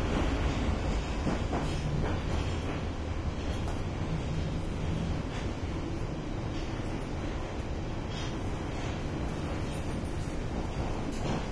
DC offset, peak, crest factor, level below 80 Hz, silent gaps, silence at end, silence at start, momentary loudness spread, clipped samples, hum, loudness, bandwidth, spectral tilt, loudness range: under 0.1%; -18 dBFS; 14 dB; -36 dBFS; none; 0 s; 0 s; 5 LU; under 0.1%; none; -34 LUFS; 11 kHz; -6.5 dB/octave; 3 LU